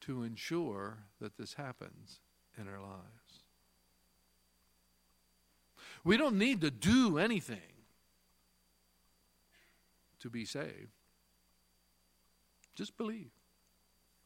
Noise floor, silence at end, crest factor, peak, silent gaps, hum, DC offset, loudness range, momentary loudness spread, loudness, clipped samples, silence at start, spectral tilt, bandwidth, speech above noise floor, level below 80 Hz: -74 dBFS; 0.95 s; 24 dB; -16 dBFS; none; 60 Hz at -65 dBFS; under 0.1%; 20 LU; 23 LU; -35 LUFS; under 0.1%; 0 s; -5 dB/octave; 16.5 kHz; 38 dB; -68 dBFS